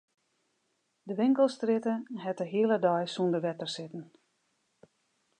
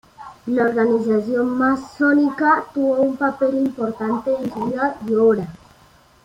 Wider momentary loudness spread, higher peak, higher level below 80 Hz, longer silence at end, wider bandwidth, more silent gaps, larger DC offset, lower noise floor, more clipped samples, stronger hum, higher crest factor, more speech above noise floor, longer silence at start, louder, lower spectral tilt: first, 13 LU vs 7 LU; second, -12 dBFS vs -4 dBFS; second, -86 dBFS vs -58 dBFS; first, 1.35 s vs 0.7 s; about the same, 10 kHz vs 10.5 kHz; neither; neither; first, -77 dBFS vs -52 dBFS; neither; neither; about the same, 18 dB vs 16 dB; first, 48 dB vs 33 dB; first, 1.05 s vs 0.2 s; second, -30 LUFS vs -19 LUFS; about the same, -6.5 dB/octave vs -7.5 dB/octave